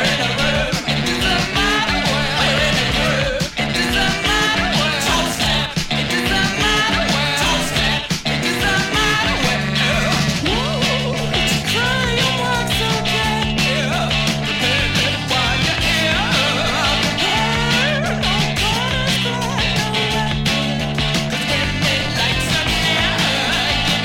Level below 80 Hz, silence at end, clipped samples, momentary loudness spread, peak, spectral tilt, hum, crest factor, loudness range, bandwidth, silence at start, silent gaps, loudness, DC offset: -32 dBFS; 0 s; under 0.1%; 3 LU; -2 dBFS; -3.5 dB/octave; none; 14 dB; 1 LU; 16.5 kHz; 0 s; none; -16 LUFS; under 0.1%